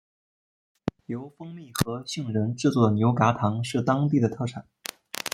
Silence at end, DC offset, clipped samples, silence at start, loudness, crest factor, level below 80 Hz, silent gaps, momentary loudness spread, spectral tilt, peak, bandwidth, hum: 0.05 s; under 0.1%; under 0.1%; 1.1 s; -26 LUFS; 22 dB; -58 dBFS; none; 15 LU; -6 dB/octave; -4 dBFS; 16.5 kHz; none